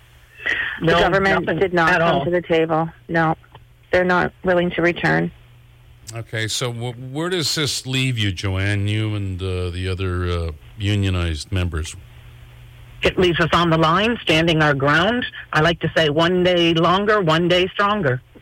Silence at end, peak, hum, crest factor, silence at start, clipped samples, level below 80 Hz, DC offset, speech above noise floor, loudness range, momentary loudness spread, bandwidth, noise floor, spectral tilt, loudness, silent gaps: 0.05 s; -8 dBFS; none; 12 dB; 0.4 s; under 0.1%; -42 dBFS; under 0.1%; 28 dB; 6 LU; 10 LU; 16.5 kHz; -47 dBFS; -5 dB/octave; -19 LUFS; none